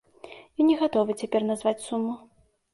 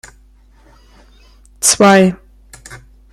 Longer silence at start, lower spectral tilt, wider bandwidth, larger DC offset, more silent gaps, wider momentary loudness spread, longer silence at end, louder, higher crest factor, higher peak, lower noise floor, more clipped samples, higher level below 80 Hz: second, 0.25 s vs 1.6 s; first, -5.5 dB/octave vs -3.5 dB/octave; second, 11.5 kHz vs 14.5 kHz; neither; neither; second, 18 LU vs 27 LU; first, 0.55 s vs 0.35 s; second, -26 LUFS vs -10 LUFS; about the same, 16 dB vs 16 dB; second, -10 dBFS vs 0 dBFS; about the same, -48 dBFS vs -46 dBFS; neither; second, -68 dBFS vs -46 dBFS